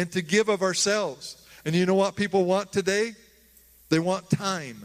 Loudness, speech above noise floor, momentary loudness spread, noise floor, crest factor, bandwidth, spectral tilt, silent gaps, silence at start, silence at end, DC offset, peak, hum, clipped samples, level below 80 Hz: -25 LUFS; 32 dB; 9 LU; -56 dBFS; 18 dB; 15.5 kHz; -4.5 dB/octave; none; 0 s; 0 s; under 0.1%; -8 dBFS; none; under 0.1%; -64 dBFS